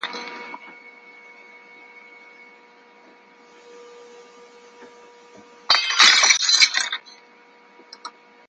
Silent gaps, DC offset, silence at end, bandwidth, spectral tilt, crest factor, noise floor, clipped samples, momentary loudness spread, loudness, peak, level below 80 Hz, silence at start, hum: none; under 0.1%; 0.4 s; 11 kHz; 3.5 dB/octave; 24 dB; -51 dBFS; under 0.1%; 28 LU; -15 LUFS; 0 dBFS; -76 dBFS; 0.05 s; none